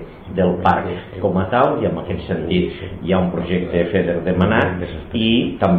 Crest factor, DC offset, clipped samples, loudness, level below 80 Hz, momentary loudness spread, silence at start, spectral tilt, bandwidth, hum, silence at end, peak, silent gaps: 16 dB; 0.2%; under 0.1%; -19 LUFS; -40 dBFS; 9 LU; 0 s; -9 dB/octave; 4.7 kHz; none; 0 s; -2 dBFS; none